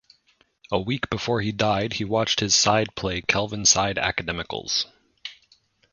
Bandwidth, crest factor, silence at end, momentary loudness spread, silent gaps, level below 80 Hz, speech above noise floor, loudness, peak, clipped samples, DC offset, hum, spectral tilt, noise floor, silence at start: 10.5 kHz; 22 dB; 0.6 s; 12 LU; none; -48 dBFS; 40 dB; -23 LUFS; -4 dBFS; under 0.1%; under 0.1%; none; -2.5 dB/octave; -64 dBFS; 0.7 s